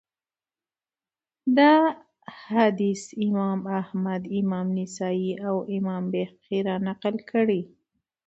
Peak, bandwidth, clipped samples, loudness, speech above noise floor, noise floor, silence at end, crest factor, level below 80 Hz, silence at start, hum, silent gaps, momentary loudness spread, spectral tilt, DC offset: -6 dBFS; 8.2 kHz; under 0.1%; -25 LUFS; over 66 dB; under -90 dBFS; 0.6 s; 20 dB; -70 dBFS; 1.45 s; none; none; 10 LU; -6.5 dB/octave; under 0.1%